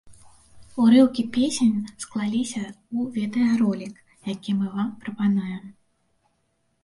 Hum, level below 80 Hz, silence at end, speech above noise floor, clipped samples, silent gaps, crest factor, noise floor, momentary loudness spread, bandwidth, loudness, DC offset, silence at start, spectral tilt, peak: none; -62 dBFS; 1.1 s; 48 dB; under 0.1%; none; 18 dB; -71 dBFS; 16 LU; 11.5 kHz; -23 LUFS; under 0.1%; 0.05 s; -5.5 dB/octave; -6 dBFS